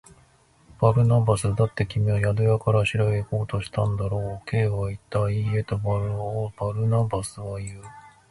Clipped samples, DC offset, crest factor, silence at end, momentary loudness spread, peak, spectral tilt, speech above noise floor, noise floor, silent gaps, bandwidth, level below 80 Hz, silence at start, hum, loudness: under 0.1%; under 0.1%; 20 dB; 0.25 s; 9 LU; -4 dBFS; -7 dB/octave; 35 dB; -58 dBFS; none; 11.5 kHz; -44 dBFS; 0.8 s; none; -24 LUFS